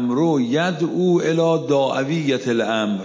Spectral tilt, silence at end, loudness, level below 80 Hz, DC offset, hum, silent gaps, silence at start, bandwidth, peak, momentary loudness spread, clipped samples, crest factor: -6 dB/octave; 0 s; -19 LUFS; -72 dBFS; under 0.1%; none; none; 0 s; 7.6 kHz; -8 dBFS; 3 LU; under 0.1%; 12 dB